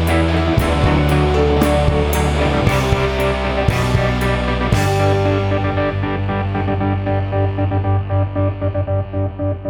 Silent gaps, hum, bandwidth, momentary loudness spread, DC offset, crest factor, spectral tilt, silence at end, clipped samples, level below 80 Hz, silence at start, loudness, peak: none; none; 19.5 kHz; 5 LU; under 0.1%; 14 dB; -6.5 dB/octave; 0 s; under 0.1%; -24 dBFS; 0 s; -17 LUFS; -2 dBFS